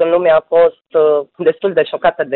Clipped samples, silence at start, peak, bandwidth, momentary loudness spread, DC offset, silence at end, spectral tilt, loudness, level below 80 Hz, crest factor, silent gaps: under 0.1%; 0 s; -2 dBFS; 4.2 kHz; 5 LU; under 0.1%; 0 s; -10 dB/octave; -14 LUFS; -54 dBFS; 10 dB; none